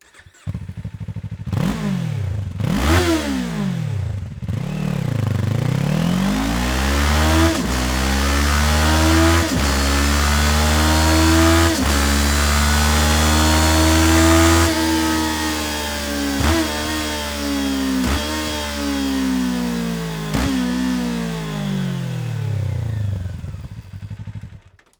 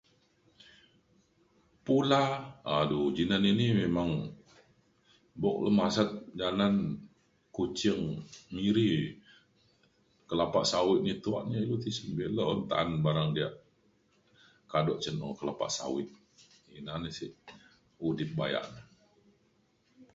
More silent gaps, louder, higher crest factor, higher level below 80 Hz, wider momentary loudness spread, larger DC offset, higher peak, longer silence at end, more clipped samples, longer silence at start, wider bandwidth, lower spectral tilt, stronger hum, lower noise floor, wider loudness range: neither; first, -18 LUFS vs -31 LUFS; about the same, 16 dB vs 20 dB; first, -26 dBFS vs -60 dBFS; about the same, 13 LU vs 13 LU; neither; first, -2 dBFS vs -12 dBFS; first, 0.4 s vs 0.1 s; neither; second, 0.45 s vs 1.85 s; first, over 20 kHz vs 8 kHz; second, -4.5 dB/octave vs -6 dB/octave; neither; second, -44 dBFS vs -71 dBFS; about the same, 8 LU vs 8 LU